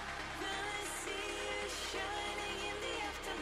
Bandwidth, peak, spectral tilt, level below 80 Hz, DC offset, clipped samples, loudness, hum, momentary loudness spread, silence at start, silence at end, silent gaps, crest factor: 15.5 kHz; -28 dBFS; -2 dB/octave; -56 dBFS; under 0.1%; under 0.1%; -39 LUFS; none; 1 LU; 0 s; 0 s; none; 14 dB